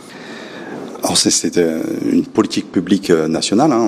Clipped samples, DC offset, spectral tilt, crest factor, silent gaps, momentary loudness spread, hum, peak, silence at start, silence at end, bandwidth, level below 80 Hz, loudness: under 0.1%; under 0.1%; -3.5 dB/octave; 16 dB; none; 17 LU; none; 0 dBFS; 0 s; 0 s; 15.5 kHz; -52 dBFS; -15 LUFS